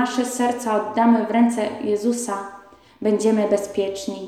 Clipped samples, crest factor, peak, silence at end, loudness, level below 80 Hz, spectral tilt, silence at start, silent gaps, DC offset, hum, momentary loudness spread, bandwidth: under 0.1%; 14 dB; -6 dBFS; 0 s; -21 LUFS; -62 dBFS; -5 dB/octave; 0 s; none; under 0.1%; none; 9 LU; 14 kHz